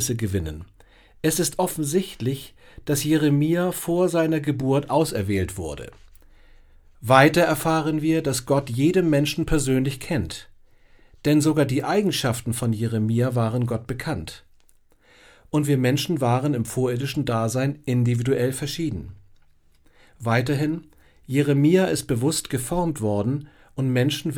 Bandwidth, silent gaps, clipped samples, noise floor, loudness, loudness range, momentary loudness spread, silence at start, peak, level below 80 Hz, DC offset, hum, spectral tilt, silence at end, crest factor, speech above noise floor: over 20 kHz; none; under 0.1%; -56 dBFS; -23 LUFS; 5 LU; 11 LU; 0 s; 0 dBFS; -44 dBFS; under 0.1%; none; -5.5 dB/octave; 0 s; 22 dB; 34 dB